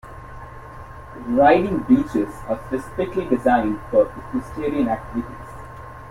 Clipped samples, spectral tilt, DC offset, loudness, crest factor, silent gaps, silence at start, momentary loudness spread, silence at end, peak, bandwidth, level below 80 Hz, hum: under 0.1%; -7.5 dB/octave; under 0.1%; -21 LUFS; 18 dB; none; 0.05 s; 22 LU; 0 s; -2 dBFS; 13 kHz; -42 dBFS; none